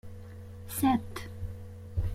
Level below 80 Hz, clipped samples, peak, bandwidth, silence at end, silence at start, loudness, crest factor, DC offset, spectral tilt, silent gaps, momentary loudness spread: -44 dBFS; under 0.1%; -14 dBFS; 16.5 kHz; 0 s; 0.05 s; -33 LUFS; 18 dB; under 0.1%; -5.5 dB/octave; none; 19 LU